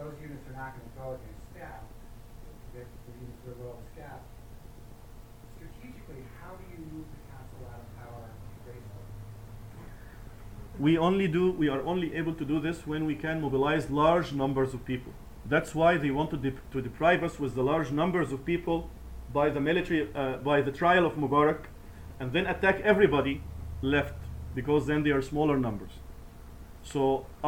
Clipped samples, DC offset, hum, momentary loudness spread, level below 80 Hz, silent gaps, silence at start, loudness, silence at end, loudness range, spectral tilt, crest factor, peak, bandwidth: under 0.1%; 0.1%; none; 23 LU; -48 dBFS; none; 0 s; -28 LUFS; 0 s; 20 LU; -7 dB/octave; 22 dB; -8 dBFS; 17 kHz